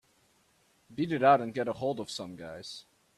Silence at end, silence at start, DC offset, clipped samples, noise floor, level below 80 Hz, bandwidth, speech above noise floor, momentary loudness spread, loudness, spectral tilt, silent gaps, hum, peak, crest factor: 0.35 s; 0.9 s; under 0.1%; under 0.1%; -68 dBFS; -70 dBFS; 12.5 kHz; 39 dB; 20 LU; -29 LUFS; -5.5 dB/octave; none; none; -10 dBFS; 22 dB